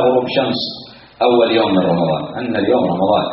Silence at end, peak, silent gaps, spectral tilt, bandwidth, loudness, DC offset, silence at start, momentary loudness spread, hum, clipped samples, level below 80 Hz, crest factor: 0 s; -2 dBFS; none; -4 dB/octave; 5.8 kHz; -16 LUFS; under 0.1%; 0 s; 8 LU; none; under 0.1%; -52 dBFS; 14 dB